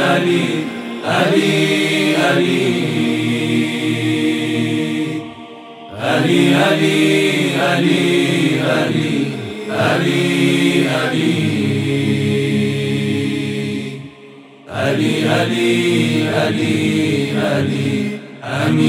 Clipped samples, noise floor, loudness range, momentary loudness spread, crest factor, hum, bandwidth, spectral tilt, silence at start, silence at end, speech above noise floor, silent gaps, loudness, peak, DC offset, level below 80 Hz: under 0.1%; -39 dBFS; 4 LU; 10 LU; 16 dB; none; 16 kHz; -5.5 dB/octave; 0 s; 0 s; 25 dB; none; -16 LUFS; 0 dBFS; under 0.1%; -62 dBFS